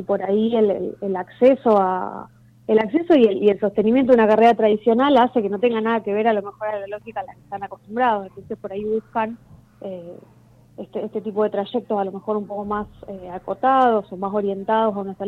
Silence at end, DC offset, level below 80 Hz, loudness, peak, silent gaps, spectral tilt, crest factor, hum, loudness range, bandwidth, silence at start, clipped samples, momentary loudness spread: 0 s; under 0.1%; -58 dBFS; -20 LUFS; -4 dBFS; none; -8 dB/octave; 16 dB; none; 10 LU; 6.2 kHz; 0 s; under 0.1%; 18 LU